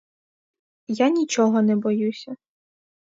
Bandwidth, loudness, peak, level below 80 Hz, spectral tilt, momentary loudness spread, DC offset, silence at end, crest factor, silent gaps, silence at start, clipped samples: 7.8 kHz; -21 LUFS; -6 dBFS; -76 dBFS; -5.5 dB/octave; 18 LU; under 0.1%; 0.75 s; 16 dB; none; 0.9 s; under 0.1%